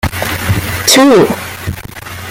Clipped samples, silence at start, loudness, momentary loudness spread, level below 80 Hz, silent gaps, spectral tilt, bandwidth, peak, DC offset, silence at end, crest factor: under 0.1%; 0.05 s; -10 LUFS; 19 LU; -32 dBFS; none; -4 dB/octave; 17 kHz; 0 dBFS; under 0.1%; 0 s; 12 dB